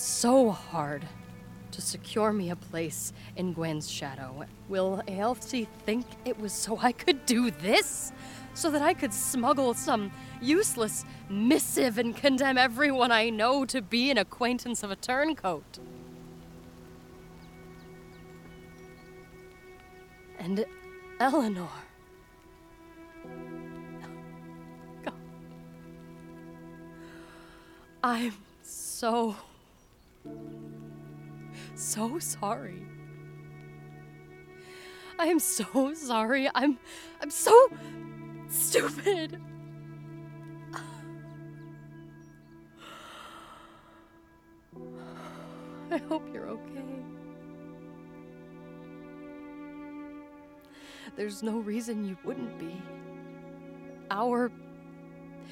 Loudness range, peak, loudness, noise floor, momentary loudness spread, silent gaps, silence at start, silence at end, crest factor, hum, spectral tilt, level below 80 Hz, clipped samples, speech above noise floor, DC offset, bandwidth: 21 LU; -6 dBFS; -29 LUFS; -59 dBFS; 24 LU; none; 0 s; 0 s; 26 dB; none; -3.5 dB/octave; -62 dBFS; under 0.1%; 31 dB; under 0.1%; 19 kHz